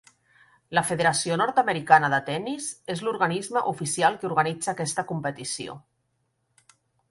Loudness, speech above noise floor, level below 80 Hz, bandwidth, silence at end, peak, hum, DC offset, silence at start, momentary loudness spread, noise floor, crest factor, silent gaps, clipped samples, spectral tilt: -25 LUFS; 49 dB; -66 dBFS; 11.5 kHz; 1.3 s; -2 dBFS; none; under 0.1%; 0.7 s; 13 LU; -74 dBFS; 24 dB; none; under 0.1%; -3.5 dB/octave